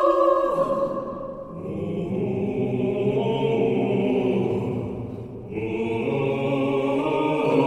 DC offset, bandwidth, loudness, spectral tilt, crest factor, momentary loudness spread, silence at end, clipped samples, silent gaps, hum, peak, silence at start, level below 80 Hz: under 0.1%; 11 kHz; -24 LUFS; -8.5 dB/octave; 16 dB; 11 LU; 0 s; under 0.1%; none; none; -8 dBFS; 0 s; -52 dBFS